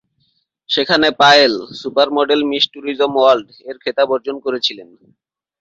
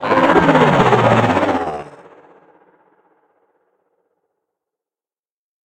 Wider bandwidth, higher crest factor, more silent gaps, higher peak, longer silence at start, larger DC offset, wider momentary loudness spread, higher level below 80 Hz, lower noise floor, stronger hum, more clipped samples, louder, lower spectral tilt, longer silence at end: second, 8 kHz vs 17 kHz; about the same, 16 dB vs 18 dB; neither; about the same, 0 dBFS vs 0 dBFS; first, 0.7 s vs 0 s; neither; about the same, 13 LU vs 11 LU; second, -60 dBFS vs -46 dBFS; second, -64 dBFS vs under -90 dBFS; neither; neither; about the same, -15 LUFS vs -13 LUFS; second, -3.5 dB/octave vs -6.5 dB/octave; second, 0.75 s vs 3.75 s